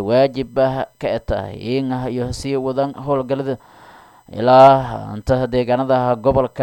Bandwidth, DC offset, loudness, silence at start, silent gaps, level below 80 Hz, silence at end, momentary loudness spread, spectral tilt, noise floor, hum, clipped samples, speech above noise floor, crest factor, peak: 17 kHz; under 0.1%; -17 LUFS; 0 s; none; -40 dBFS; 0 s; 13 LU; -7 dB/octave; -45 dBFS; none; under 0.1%; 28 dB; 16 dB; 0 dBFS